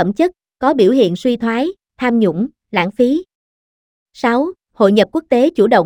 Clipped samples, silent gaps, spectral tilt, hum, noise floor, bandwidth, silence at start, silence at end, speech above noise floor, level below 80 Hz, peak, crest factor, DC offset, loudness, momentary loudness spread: under 0.1%; 3.35-4.06 s; -7 dB/octave; none; under -90 dBFS; 14 kHz; 0 s; 0 s; over 76 dB; -54 dBFS; 0 dBFS; 16 dB; under 0.1%; -15 LUFS; 8 LU